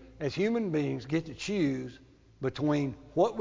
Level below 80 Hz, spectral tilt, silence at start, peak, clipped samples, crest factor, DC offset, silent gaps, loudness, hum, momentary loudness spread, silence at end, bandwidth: -60 dBFS; -6.5 dB/octave; 0 s; -14 dBFS; under 0.1%; 18 dB; under 0.1%; none; -31 LUFS; none; 7 LU; 0 s; 7.6 kHz